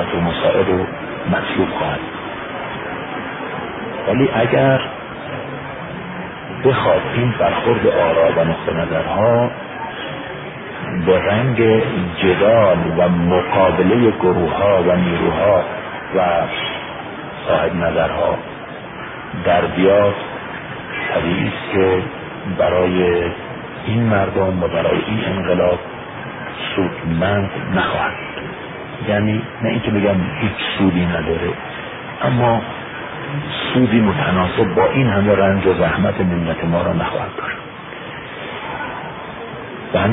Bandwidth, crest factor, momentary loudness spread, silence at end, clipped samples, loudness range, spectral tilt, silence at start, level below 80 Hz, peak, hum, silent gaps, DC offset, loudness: 4 kHz; 16 dB; 14 LU; 0 s; under 0.1%; 5 LU; -12 dB/octave; 0 s; -40 dBFS; 0 dBFS; none; none; under 0.1%; -18 LUFS